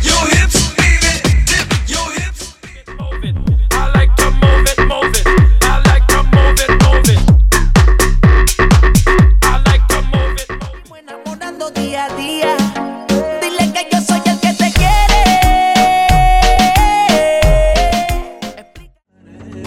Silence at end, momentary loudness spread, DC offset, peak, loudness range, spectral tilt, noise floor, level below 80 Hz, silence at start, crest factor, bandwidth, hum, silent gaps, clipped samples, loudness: 0 s; 12 LU; under 0.1%; 0 dBFS; 7 LU; -4.5 dB/octave; -43 dBFS; -14 dBFS; 0 s; 10 dB; 16.5 kHz; none; none; under 0.1%; -12 LUFS